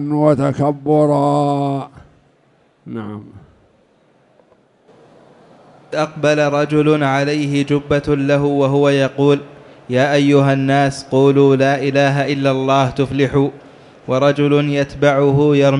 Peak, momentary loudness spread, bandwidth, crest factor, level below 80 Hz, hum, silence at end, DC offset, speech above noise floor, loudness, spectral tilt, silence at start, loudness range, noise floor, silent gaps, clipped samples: 0 dBFS; 9 LU; 11 kHz; 14 dB; -48 dBFS; none; 0 s; under 0.1%; 41 dB; -15 LUFS; -7 dB/octave; 0 s; 18 LU; -55 dBFS; none; under 0.1%